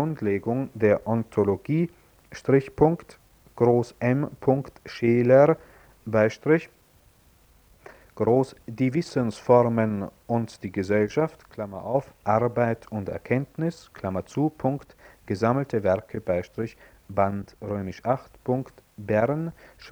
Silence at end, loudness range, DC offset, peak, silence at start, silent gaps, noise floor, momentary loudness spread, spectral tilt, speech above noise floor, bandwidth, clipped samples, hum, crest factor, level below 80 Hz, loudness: 0 s; 5 LU; under 0.1%; -4 dBFS; 0 s; none; -58 dBFS; 12 LU; -8 dB/octave; 34 dB; over 20 kHz; under 0.1%; none; 22 dB; -56 dBFS; -25 LUFS